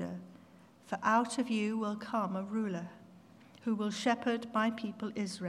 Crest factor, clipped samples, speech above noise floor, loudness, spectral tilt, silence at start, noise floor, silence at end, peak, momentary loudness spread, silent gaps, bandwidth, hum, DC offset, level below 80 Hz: 20 dB; under 0.1%; 25 dB; -34 LUFS; -5 dB/octave; 0 s; -59 dBFS; 0 s; -16 dBFS; 12 LU; none; 12 kHz; none; under 0.1%; -84 dBFS